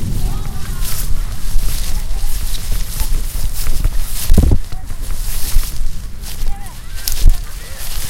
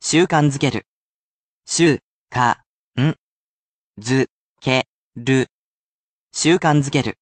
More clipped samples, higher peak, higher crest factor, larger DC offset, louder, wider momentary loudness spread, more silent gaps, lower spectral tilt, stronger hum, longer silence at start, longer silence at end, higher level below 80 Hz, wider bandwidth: first, 0.6% vs under 0.1%; about the same, 0 dBFS vs -2 dBFS; second, 12 dB vs 18 dB; neither; second, -22 LUFS vs -19 LUFS; second, 11 LU vs 14 LU; second, none vs 0.88-1.62 s, 2.03-2.28 s, 2.66-2.93 s, 3.18-3.93 s, 4.30-4.56 s, 4.88-5.11 s, 5.50-6.29 s; about the same, -4 dB/octave vs -5 dB/octave; neither; about the same, 0 s vs 0 s; about the same, 0 s vs 0.1 s; first, -16 dBFS vs -56 dBFS; first, 16.5 kHz vs 9.6 kHz